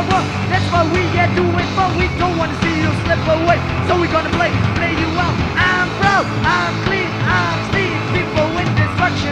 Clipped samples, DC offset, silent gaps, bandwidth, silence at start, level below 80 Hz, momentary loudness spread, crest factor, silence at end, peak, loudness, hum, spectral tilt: under 0.1%; under 0.1%; none; 10.5 kHz; 0 s; -32 dBFS; 3 LU; 14 dB; 0 s; -2 dBFS; -16 LUFS; none; -6 dB/octave